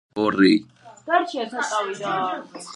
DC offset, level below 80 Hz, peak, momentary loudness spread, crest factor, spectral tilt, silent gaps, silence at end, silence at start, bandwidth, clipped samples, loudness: under 0.1%; -66 dBFS; -4 dBFS; 10 LU; 18 dB; -4.5 dB/octave; none; 0 s; 0.15 s; 11 kHz; under 0.1%; -22 LUFS